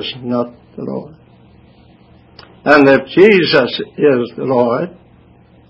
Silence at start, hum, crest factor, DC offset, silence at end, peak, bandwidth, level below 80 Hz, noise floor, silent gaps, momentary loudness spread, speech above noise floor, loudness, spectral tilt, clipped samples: 0 s; none; 14 dB; under 0.1%; 0.8 s; 0 dBFS; 8 kHz; -52 dBFS; -46 dBFS; none; 17 LU; 33 dB; -12 LUFS; -7 dB/octave; 0.2%